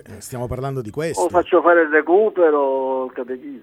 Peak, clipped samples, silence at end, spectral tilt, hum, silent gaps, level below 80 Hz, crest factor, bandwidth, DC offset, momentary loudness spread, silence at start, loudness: -2 dBFS; under 0.1%; 0.05 s; -6 dB/octave; none; none; -48 dBFS; 16 dB; 14 kHz; under 0.1%; 15 LU; 0.1 s; -18 LUFS